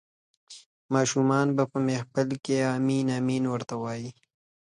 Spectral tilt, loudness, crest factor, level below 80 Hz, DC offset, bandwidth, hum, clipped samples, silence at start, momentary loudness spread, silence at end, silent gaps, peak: -6 dB/octave; -27 LUFS; 18 dB; -68 dBFS; under 0.1%; 10.5 kHz; none; under 0.1%; 0.5 s; 9 LU; 0.6 s; 0.66-0.89 s; -10 dBFS